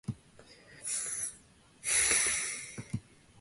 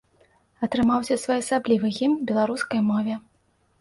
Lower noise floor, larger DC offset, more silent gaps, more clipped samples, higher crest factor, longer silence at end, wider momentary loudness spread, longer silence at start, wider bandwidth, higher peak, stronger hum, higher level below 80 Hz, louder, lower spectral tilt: second, -60 dBFS vs -65 dBFS; neither; neither; neither; first, 24 dB vs 14 dB; second, 0.4 s vs 0.6 s; first, 17 LU vs 6 LU; second, 0.1 s vs 0.6 s; about the same, 12 kHz vs 11.5 kHz; about the same, -12 dBFS vs -10 dBFS; neither; about the same, -60 dBFS vs -56 dBFS; second, -31 LUFS vs -24 LUFS; second, -1 dB/octave vs -5.5 dB/octave